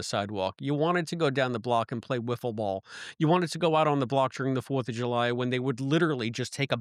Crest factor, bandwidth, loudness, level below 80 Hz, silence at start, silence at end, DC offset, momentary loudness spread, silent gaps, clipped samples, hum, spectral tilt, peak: 16 dB; 14 kHz; -28 LUFS; -72 dBFS; 0 s; 0 s; under 0.1%; 7 LU; none; under 0.1%; none; -6 dB/octave; -12 dBFS